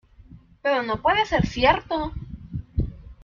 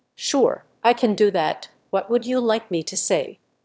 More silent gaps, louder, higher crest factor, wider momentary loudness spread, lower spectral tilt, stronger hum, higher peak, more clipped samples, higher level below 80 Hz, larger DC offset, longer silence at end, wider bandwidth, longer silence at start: neither; about the same, -23 LUFS vs -22 LUFS; about the same, 20 dB vs 18 dB; first, 14 LU vs 7 LU; first, -6 dB/octave vs -3.5 dB/octave; neither; about the same, -4 dBFS vs -4 dBFS; neither; first, -38 dBFS vs -72 dBFS; neither; second, 0.1 s vs 0.3 s; about the same, 7.4 kHz vs 8 kHz; about the same, 0.3 s vs 0.2 s